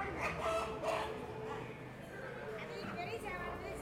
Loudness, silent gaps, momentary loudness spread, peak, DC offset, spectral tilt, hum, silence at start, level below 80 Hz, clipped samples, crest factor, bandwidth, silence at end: -42 LUFS; none; 10 LU; -26 dBFS; under 0.1%; -5 dB/octave; none; 0 s; -58 dBFS; under 0.1%; 16 dB; 16 kHz; 0 s